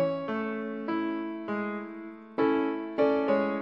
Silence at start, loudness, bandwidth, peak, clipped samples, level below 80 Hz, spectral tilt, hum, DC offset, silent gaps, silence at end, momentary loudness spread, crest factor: 0 s; -30 LUFS; 5.8 kHz; -14 dBFS; under 0.1%; -76 dBFS; -8.5 dB/octave; none; under 0.1%; none; 0 s; 11 LU; 16 dB